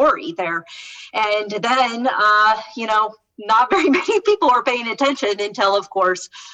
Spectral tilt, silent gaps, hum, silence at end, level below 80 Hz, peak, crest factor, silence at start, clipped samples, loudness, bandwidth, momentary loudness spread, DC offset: -3 dB/octave; none; none; 0 s; -60 dBFS; -6 dBFS; 12 dB; 0 s; under 0.1%; -18 LUFS; 9 kHz; 10 LU; under 0.1%